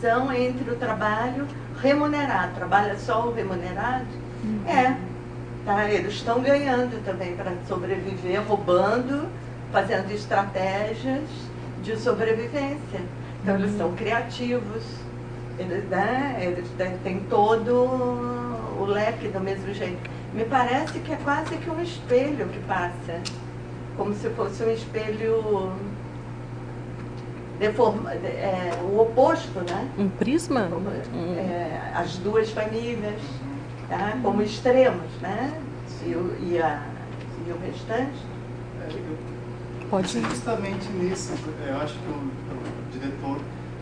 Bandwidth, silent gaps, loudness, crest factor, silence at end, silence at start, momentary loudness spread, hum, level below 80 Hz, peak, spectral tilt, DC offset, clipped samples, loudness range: 10 kHz; none; -26 LUFS; 20 dB; 0 s; 0 s; 14 LU; 60 Hz at -40 dBFS; -48 dBFS; -6 dBFS; -6.5 dB/octave; under 0.1%; under 0.1%; 5 LU